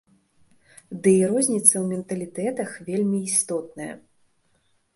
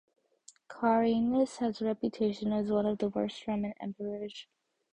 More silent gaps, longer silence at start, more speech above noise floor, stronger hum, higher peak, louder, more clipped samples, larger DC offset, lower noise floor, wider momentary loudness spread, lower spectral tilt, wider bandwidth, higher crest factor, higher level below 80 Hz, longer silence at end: neither; first, 0.9 s vs 0.7 s; first, 43 dB vs 30 dB; neither; first, -2 dBFS vs -14 dBFS; first, -22 LUFS vs -32 LUFS; neither; neither; first, -66 dBFS vs -61 dBFS; first, 18 LU vs 12 LU; second, -4.5 dB/octave vs -6.5 dB/octave; first, 12 kHz vs 10 kHz; first, 24 dB vs 18 dB; about the same, -68 dBFS vs -66 dBFS; first, 0.95 s vs 0.5 s